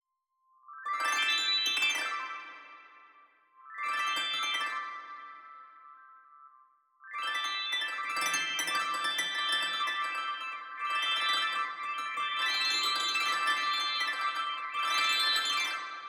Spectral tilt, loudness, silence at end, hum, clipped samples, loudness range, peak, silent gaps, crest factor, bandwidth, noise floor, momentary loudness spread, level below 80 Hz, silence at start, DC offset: 2 dB/octave; -30 LUFS; 0 s; none; under 0.1%; 7 LU; -16 dBFS; none; 16 dB; 18 kHz; -77 dBFS; 14 LU; under -90 dBFS; 0.7 s; under 0.1%